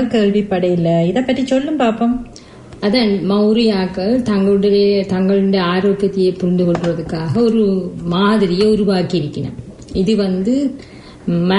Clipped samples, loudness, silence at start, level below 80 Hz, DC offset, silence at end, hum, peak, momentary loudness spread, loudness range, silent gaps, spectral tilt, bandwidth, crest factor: under 0.1%; -15 LUFS; 0 s; -42 dBFS; under 0.1%; 0 s; none; -2 dBFS; 8 LU; 2 LU; none; -7.5 dB/octave; 11 kHz; 12 dB